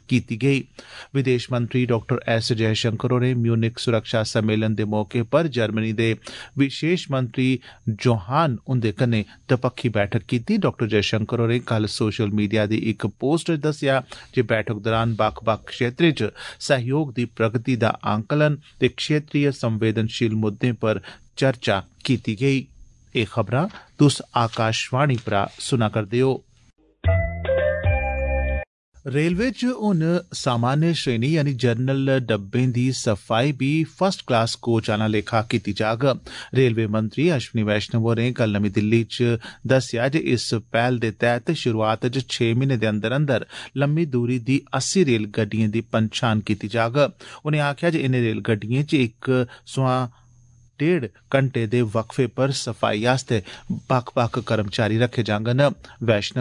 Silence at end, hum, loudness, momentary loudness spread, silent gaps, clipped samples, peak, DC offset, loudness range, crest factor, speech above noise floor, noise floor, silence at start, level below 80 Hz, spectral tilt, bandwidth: 0 s; none; -22 LUFS; 4 LU; 28.67-28.92 s; under 0.1%; -6 dBFS; under 0.1%; 2 LU; 16 dB; 31 dB; -53 dBFS; 0.1 s; -42 dBFS; -6 dB/octave; 11 kHz